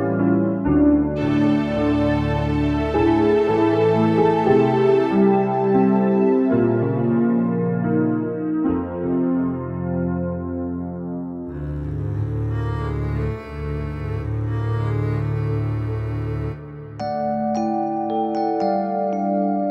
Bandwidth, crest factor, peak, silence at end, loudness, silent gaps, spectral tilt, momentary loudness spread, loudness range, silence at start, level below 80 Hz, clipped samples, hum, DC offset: 7 kHz; 14 dB; -6 dBFS; 0 s; -21 LUFS; none; -9.5 dB/octave; 10 LU; 9 LU; 0 s; -36 dBFS; under 0.1%; none; under 0.1%